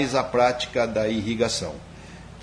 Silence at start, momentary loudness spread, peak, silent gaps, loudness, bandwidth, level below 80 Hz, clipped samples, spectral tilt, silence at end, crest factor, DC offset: 0 s; 21 LU; -6 dBFS; none; -24 LUFS; 10.5 kHz; -48 dBFS; under 0.1%; -4.5 dB/octave; 0 s; 18 dB; under 0.1%